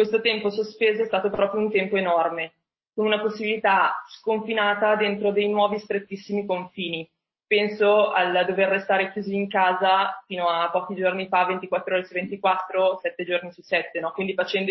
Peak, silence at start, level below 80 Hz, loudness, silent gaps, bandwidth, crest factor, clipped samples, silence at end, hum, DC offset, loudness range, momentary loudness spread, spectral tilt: -8 dBFS; 0 s; -70 dBFS; -23 LUFS; none; 6 kHz; 16 dB; under 0.1%; 0 s; none; under 0.1%; 3 LU; 9 LU; -6.5 dB/octave